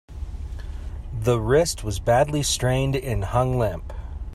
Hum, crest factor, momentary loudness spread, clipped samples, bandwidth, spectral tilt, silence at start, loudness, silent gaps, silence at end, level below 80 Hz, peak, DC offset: none; 18 dB; 16 LU; under 0.1%; 14.5 kHz; -5 dB/octave; 0.1 s; -22 LUFS; none; 0 s; -34 dBFS; -6 dBFS; under 0.1%